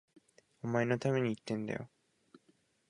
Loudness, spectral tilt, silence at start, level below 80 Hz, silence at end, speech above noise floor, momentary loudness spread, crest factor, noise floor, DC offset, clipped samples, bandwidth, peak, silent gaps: -35 LUFS; -7 dB/octave; 0.65 s; -72 dBFS; 1.05 s; 38 dB; 12 LU; 20 dB; -72 dBFS; under 0.1%; under 0.1%; 11.5 kHz; -16 dBFS; none